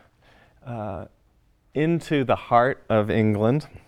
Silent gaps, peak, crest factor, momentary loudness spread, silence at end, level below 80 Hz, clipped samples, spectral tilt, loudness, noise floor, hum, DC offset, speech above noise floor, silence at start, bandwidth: none; -4 dBFS; 20 dB; 14 LU; 0.1 s; -54 dBFS; under 0.1%; -8 dB/octave; -23 LUFS; -62 dBFS; none; under 0.1%; 39 dB; 0.65 s; 12.5 kHz